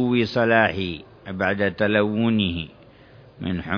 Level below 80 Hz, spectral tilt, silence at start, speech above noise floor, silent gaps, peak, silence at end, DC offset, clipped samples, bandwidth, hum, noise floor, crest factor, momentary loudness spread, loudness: -50 dBFS; -7.5 dB/octave; 0 s; 27 dB; none; -2 dBFS; 0 s; under 0.1%; under 0.1%; 5.4 kHz; none; -48 dBFS; 20 dB; 15 LU; -22 LUFS